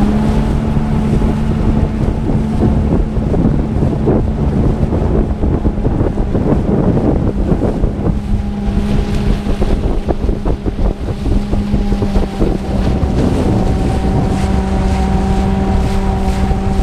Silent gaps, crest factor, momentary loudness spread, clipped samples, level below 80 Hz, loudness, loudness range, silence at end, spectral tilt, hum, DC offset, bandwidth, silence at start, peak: none; 12 dB; 4 LU; under 0.1%; -18 dBFS; -15 LUFS; 3 LU; 0 s; -8.5 dB/octave; none; under 0.1%; 11 kHz; 0 s; 0 dBFS